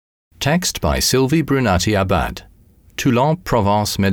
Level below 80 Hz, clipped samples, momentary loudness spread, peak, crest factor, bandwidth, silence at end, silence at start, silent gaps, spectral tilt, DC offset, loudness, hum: -34 dBFS; under 0.1%; 7 LU; -4 dBFS; 12 dB; 19.5 kHz; 0 s; 0.4 s; none; -4.5 dB/octave; under 0.1%; -17 LUFS; none